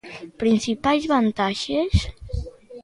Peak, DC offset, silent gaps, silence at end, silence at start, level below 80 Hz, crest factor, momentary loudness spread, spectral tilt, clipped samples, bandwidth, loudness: -6 dBFS; under 0.1%; none; 0 s; 0.05 s; -34 dBFS; 18 dB; 13 LU; -5.5 dB/octave; under 0.1%; 11.5 kHz; -22 LUFS